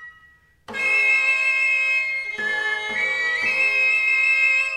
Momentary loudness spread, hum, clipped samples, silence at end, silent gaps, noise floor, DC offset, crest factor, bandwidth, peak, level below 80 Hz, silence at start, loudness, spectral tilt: 8 LU; none; under 0.1%; 0 s; none; -54 dBFS; under 0.1%; 12 dB; 14 kHz; -8 dBFS; -64 dBFS; 0 s; -18 LUFS; -0.5 dB/octave